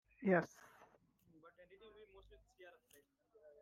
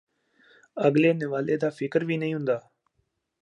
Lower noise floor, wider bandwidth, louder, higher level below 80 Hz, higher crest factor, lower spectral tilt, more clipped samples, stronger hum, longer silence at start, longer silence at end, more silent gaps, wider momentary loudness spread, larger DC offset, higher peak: about the same, -72 dBFS vs -75 dBFS; first, 14.5 kHz vs 9.6 kHz; second, -38 LUFS vs -26 LUFS; about the same, -78 dBFS vs -74 dBFS; first, 24 dB vs 18 dB; about the same, -7.5 dB/octave vs -8 dB/octave; neither; neither; second, 0.2 s vs 0.75 s; first, 0.95 s vs 0.8 s; neither; first, 28 LU vs 8 LU; neither; second, -22 dBFS vs -8 dBFS